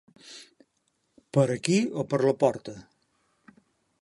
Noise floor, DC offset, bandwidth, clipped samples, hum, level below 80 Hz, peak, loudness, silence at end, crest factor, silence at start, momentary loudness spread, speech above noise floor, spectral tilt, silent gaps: -74 dBFS; under 0.1%; 11.5 kHz; under 0.1%; none; -70 dBFS; -6 dBFS; -26 LUFS; 1.2 s; 24 dB; 0.25 s; 22 LU; 48 dB; -6 dB/octave; none